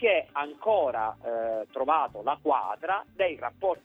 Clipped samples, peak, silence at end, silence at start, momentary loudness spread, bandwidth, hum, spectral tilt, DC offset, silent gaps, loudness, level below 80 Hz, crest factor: under 0.1%; -10 dBFS; 0.1 s; 0 s; 6 LU; 4 kHz; none; -6 dB/octave; under 0.1%; none; -29 LUFS; -66 dBFS; 18 dB